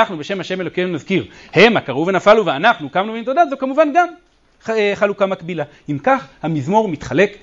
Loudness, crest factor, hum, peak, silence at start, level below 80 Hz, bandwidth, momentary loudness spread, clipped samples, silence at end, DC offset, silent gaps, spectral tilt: -17 LUFS; 16 dB; none; 0 dBFS; 0 s; -52 dBFS; 7.8 kHz; 11 LU; under 0.1%; 0.05 s; under 0.1%; none; -6 dB/octave